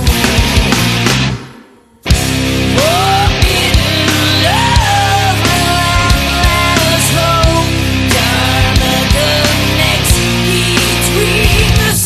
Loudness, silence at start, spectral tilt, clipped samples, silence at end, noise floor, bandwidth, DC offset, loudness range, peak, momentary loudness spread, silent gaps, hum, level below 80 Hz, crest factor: -10 LUFS; 0 s; -4 dB/octave; under 0.1%; 0 s; -40 dBFS; 14.5 kHz; under 0.1%; 2 LU; 0 dBFS; 3 LU; none; none; -18 dBFS; 10 dB